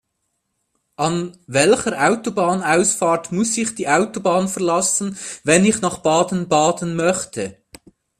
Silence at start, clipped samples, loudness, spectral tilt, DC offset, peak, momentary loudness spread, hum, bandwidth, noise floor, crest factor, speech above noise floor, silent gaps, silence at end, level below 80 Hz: 1 s; under 0.1%; -18 LUFS; -4 dB/octave; under 0.1%; 0 dBFS; 8 LU; none; 15 kHz; -73 dBFS; 20 dB; 55 dB; none; 0.65 s; -56 dBFS